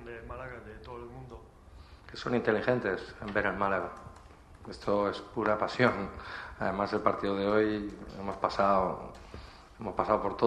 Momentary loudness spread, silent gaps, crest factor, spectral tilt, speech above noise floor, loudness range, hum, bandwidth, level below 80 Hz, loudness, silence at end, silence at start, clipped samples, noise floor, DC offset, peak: 20 LU; none; 24 dB; -6.5 dB/octave; 22 dB; 3 LU; none; 11.5 kHz; -54 dBFS; -31 LUFS; 0 s; 0 s; under 0.1%; -53 dBFS; under 0.1%; -8 dBFS